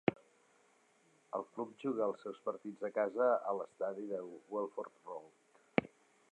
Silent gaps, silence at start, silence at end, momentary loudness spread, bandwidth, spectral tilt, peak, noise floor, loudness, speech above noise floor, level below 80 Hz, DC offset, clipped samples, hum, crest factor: none; 0.05 s; 0.45 s; 14 LU; 10 kHz; -7 dB/octave; -10 dBFS; -71 dBFS; -39 LUFS; 32 dB; -80 dBFS; under 0.1%; under 0.1%; none; 28 dB